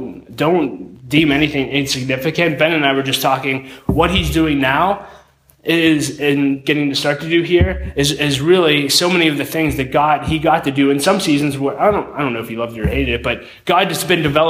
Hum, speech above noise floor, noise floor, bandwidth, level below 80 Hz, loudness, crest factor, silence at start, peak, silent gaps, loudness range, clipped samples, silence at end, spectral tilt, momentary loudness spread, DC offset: none; 31 dB; -47 dBFS; 16 kHz; -34 dBFS; -16 LUFS; 14 dB; 0 s; 0 dBFS; none; 2 LU; under 0.1%; 0 s; -4.5 dB/octave; 8 LU; under 0.1%